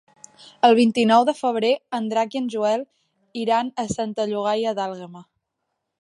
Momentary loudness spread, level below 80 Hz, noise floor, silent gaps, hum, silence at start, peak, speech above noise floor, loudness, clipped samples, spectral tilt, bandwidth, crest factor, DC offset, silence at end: 13 LU; -62 dBFS; -78 dBFS; none; none; 0.45 s; -4 dBFS; 57 dB; -21 LUFS; under 0.1%; -5 dB/octave; 11 kHz; 18 dB; under 0.1%; 0.8 s